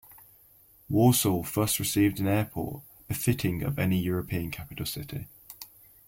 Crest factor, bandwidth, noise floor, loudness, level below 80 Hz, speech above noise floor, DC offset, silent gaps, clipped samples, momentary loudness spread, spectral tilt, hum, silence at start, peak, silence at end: 18 dB; 16.5 kHz; -58 dBFS; -28 LUFS; -52 dBFS; 31 dB; under 0.1%; none; under 0.1%; 21 LU; -5 dB/octave; none; 0.1 s; -10 dBFS; 0.4 s